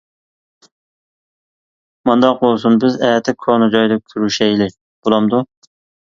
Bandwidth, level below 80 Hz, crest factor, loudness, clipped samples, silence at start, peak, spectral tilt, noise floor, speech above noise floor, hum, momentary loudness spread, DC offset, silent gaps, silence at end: 7.4 kHz; -56 dBFS; 16 dB; -15 LUFS; under 0.1%; 2.05 s; 0 dBFS; -5.5 dB/octave; under -90 dBFS; over 76 dB; none; 7 LU; under 0.1%; 4.81-5.03 s; 0.7 s